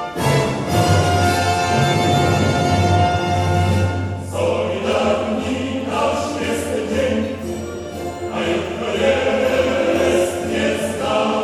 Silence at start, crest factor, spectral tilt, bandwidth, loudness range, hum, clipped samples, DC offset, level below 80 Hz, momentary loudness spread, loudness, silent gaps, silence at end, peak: 0 s; 14 dB; -5.5 dB/octave; 15 kHz; 5 LU; none; under 0.1%; under 0.1%; -40 dBFS; 7 LU; -18 LUFS; none; 0 s; -4 dBFS